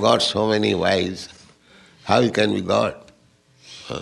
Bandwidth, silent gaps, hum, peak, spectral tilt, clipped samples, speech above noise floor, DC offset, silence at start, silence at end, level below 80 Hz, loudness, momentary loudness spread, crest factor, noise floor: 12 kHz; none; none; -2 dBFS; -4.5 dB/octave; under 0.1%; 37 dB; under 0.1%; 0 s; 0 s; -56 dBFS; -20 LUFS; 20 LU; 20 dB; -57 dBFS